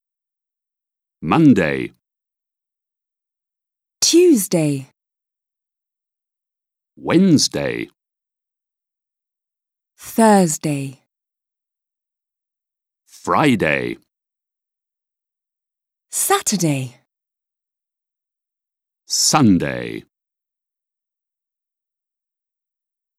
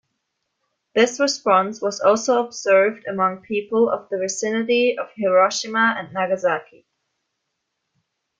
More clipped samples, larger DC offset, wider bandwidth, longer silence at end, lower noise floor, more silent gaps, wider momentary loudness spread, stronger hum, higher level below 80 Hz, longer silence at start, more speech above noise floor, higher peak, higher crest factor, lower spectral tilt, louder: neither; neither; first, 16.5 kHz vs 9.4 kHz; first, 3.15 s vs 1.75 s; first, -87 dBFS vs -77 dBFS; neither; first, 18 LU vs 7 LU; neither; first, -56 dBFS vs -70 dBFS; first, 1.2 s vs 0.95 s; first, 71 dB vs 57 dB; first, 0 dBFS vs -4 dBFS; about the same, 20 dB vs 18 dB; about the same, -4 dB/octave vs -3 dB/octave; first, -16 LUFS vs -20 LUFS